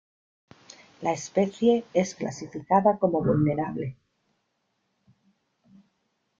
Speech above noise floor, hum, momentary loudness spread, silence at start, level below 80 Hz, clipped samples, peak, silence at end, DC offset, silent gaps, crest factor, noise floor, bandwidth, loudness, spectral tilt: 51 dB; none; 12 LU; 1 s; -62 dBFS; under 0.1%; -8 dBFS; 2.45 s; under 0.1%; none; 20 dB; -76 dBFS; 7.8 kHz; -25 LUFS; -6.5 dB/octave